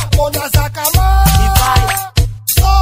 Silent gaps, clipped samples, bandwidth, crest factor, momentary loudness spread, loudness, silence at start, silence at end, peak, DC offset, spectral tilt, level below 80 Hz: none; under 0.1%; 16.5 kHz; 12 dB; 5 LU; -13 LUFS; 0 s; 0 s; 0 dBFS; under 0.1%; -4 dB/octave; -14 dBFS